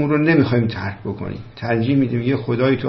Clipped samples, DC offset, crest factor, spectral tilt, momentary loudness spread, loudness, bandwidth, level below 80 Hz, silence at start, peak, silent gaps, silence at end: under 0.1%; under 0.1%; 16 dB; -9.5 dB/octave; 13 LU; -19 LUFS; 6 kHz; -48 dBFS; 0 s; -2 dBFS; none; 0 s